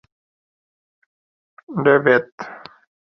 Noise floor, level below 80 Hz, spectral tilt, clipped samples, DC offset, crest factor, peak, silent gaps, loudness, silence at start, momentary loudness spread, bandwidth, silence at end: under -90 dBFS; -66 dBFS; -8 dB/octave; under 0.1%; under 0.1%; 20 dB; -2 dBFS; 2.32-2.38 s; -17 LUFS; 1.7 s; 20 LU; 6.2 kHz; 0.5 s